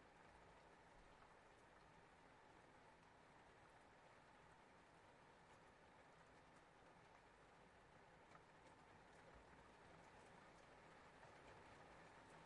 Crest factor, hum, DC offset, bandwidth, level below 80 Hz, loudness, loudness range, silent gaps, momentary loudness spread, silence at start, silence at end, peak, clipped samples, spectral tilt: 18 dB; none; under 0.1%; 10.5 kHz; -82 dBFS; -68 LUFS; 3 LU; none; 4 LU; 0 s; 0 s; -50 dBFS; under 0.1%; -4.5 dB/octave